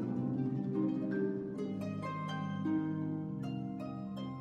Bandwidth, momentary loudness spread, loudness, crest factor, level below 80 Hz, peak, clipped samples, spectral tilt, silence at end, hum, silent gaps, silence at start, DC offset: 9.2 kHz; 7 LU; -37 LUFS; 12 dB; -70 dBFS; -24 dBFS; under 0.1%; -8.5 dB/octave; 0 s; none; none; 0 s; under 0.1%